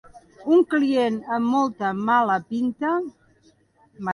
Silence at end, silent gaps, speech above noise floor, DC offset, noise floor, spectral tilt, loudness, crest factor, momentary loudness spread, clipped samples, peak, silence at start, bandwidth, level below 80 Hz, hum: 0 s; none; 38 dB; under 0.1%; -59 dBFS; -6.5 dB/octave; -22 LUFS; 16 dB; 8 LU; under 0.1%; -8 dBFS; 0.15 s; 11 kHz; -66 dBFS; none